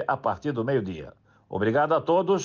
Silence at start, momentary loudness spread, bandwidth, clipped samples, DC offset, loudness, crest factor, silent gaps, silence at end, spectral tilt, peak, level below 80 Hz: 0 s; 14 LU; 7.2 kHz; under 0.1%; under 0.1%; -26 LUFS; 12 dB; none; 0 s; -6.5 dB/octave; -12 dBFS; -62 dBFS